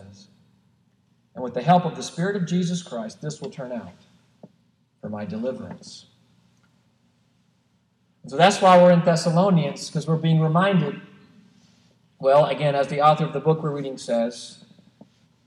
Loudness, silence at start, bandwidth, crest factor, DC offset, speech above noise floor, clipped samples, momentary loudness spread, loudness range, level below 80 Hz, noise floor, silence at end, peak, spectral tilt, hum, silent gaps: -21 LUFS; 0.05 s; 11 kHz; 20 dB; under 0.1%; 45 dB; under 0.1%; 19 LU; 18 LU; -72 dBFS; -65 dBFS; 0.95 s; -2 dBFS; -6 dB/octave; none; none